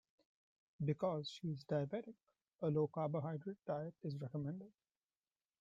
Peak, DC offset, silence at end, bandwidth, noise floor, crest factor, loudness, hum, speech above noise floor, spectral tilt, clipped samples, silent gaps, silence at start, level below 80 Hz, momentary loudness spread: -26 dBFS; under 0.1%; 0.9 s; 7.6 kHz; under -90 dBFS; 18 dB; -43 LUFS; none; over 48 dB; -8 dB/octave; under 0.1%; 2.55-2.59 s; 0.8 s; -80 dBFS; 9 LU